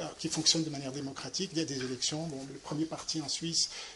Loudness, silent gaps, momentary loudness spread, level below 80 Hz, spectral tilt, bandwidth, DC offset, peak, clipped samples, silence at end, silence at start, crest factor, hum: -32 LUFS; none; 12 LU; -66 dBFS; -3 dB/octave; 11.5 kHz; under 0.1%; -10 dBFS; under 0.1%; 0 s; 0 s; 24 dB; none